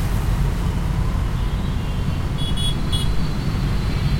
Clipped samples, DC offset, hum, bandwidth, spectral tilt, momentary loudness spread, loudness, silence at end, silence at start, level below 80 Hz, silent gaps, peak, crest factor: under 0.1%; under 0.1%; none; 16.5 kHz; -6 dB/octave; 2 LU; -23 LUFS; 0 s; 0 s; -24 dBFS; none; -6 dBFS; 12 dB